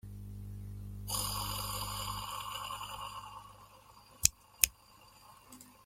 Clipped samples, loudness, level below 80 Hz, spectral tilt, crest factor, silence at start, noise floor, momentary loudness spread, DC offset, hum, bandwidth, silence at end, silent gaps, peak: under 0.1%; -36 LUFS; -52 dBFS; -1 dB/octave; 40 dB; 0.05 s; -60 dBFS; 24 LU; under 0.1%; 50 Hz at -55 dBFS; 16.5 kHz; 0 s; none; 0 dBFS